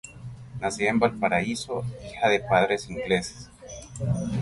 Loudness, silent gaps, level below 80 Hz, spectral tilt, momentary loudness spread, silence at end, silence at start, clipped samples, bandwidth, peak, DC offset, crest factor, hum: -26 LUFS; none; -50 dBFS; -5 dB/octave; 19 LU; 0 s; 0.05 s; under 0.1%; 11.5 kHz; -6 dBFS; under 0.1%; 20 dB; none